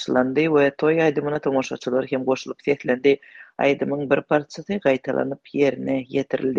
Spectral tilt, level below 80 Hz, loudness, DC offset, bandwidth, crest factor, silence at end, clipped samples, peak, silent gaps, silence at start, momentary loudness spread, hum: -6.5 dB/octave; -62 dBFS; -22 LUFS; under 0.1%; 7.4 kHz; 18 dB; 0 s; under 0.1%; -4 dBFS; none; 0 s; 6 LU; none